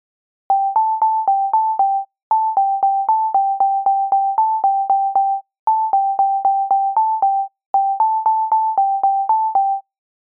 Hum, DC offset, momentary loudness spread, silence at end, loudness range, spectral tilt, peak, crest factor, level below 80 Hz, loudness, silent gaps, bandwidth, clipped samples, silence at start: none; under 0.1%; 3 LU; 0.5 s; 1 LU; -7.5 dB/octave; -8 dBFS; 10 dB; -78 dBFS; -17 LUFS; 2.23-2.31 s, 5.59-5.67 s, 7.66-7.74 s; 2 kHz; under 0.1%; 0.5 s